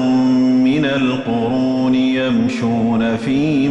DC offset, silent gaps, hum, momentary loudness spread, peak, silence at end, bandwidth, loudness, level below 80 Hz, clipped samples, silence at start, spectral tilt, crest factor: under 0.1%; none; none; 4 LU; -6 dBFS; 0 s; 8.2 kHz; -16 LUFS; -48 dBFS; under 0.1%; 0 s; -7 dB/octave; 8 dB